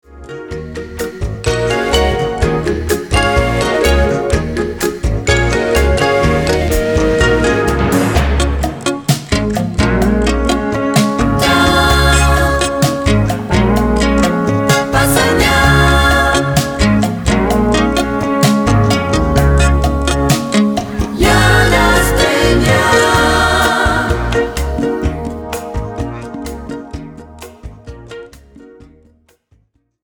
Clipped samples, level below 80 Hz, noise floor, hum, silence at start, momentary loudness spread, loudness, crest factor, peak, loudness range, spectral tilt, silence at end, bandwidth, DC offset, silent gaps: under 0.1%; -20 dBFS; -56 dBFS; none; 0.1 s; 13 LU; -13 LUFS; 12 dB; 0 dBFS; 8 LU; -5 dB/octave; 1.35 s; over 20 kHz; under 0.1%; none